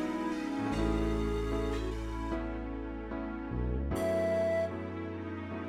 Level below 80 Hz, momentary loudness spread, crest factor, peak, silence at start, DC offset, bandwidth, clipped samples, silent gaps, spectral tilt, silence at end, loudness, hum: -40 dBFS; 9 LU; 14 dB; -18 dBFS; 0 s; under 0.1%; 14 kHz; under 0.1%; none; -7 dB/octave; 0 s; -34 LUFS; none